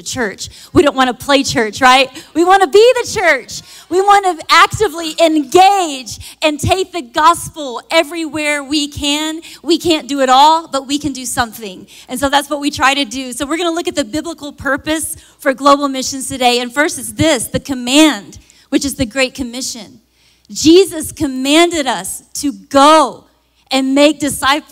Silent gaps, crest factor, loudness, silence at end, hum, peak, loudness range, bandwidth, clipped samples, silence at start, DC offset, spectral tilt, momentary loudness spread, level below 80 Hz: none; 14 dB; -13 LUFS; 0.1 s; none; 0 dBFS; 5 LU; 16.5 kHz; under 0.1%; 0.05 s; under 0.1%; -3 dB/octave; 12 LU; -42 dBFS